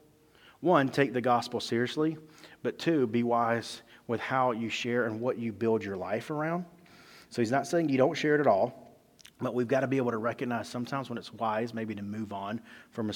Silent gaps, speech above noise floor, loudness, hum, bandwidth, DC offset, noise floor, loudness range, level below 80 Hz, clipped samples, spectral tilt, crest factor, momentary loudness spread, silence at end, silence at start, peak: none; 30 dB; -30 LUFS; none; 17.5 kHz; under 0.1%; -59 dBFS; 4 LU; -74 dBFS; under 0.1%; -6 dB/octave; 22 dB; 11 LU; 0 s; 0.6 s; -8 dBFS